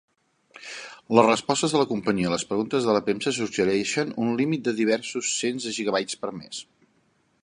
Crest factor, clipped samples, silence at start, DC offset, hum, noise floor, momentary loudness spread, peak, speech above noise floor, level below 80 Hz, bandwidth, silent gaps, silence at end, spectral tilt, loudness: 24 dB; under 0.1%; 0.6 s; under 0.1%; none; -66 dBFS; 16 LU; -2 dBFS; 42 dB; -64 dBFS; 11 kHz; none; 0.8 s; -4 dB/octave; -24 LUFS